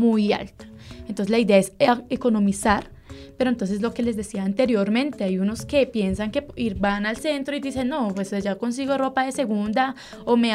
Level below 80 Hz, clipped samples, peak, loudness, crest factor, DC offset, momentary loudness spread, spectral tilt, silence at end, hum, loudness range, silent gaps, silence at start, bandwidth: -46 dBFS; under 0.1%; -4 dBFS; -23 LUFS; 20 dB; under 0.1%; 8 LU; -5.5 dB/octave; 0 s; none; 3 LU; none; 0 s; 13.5 kHz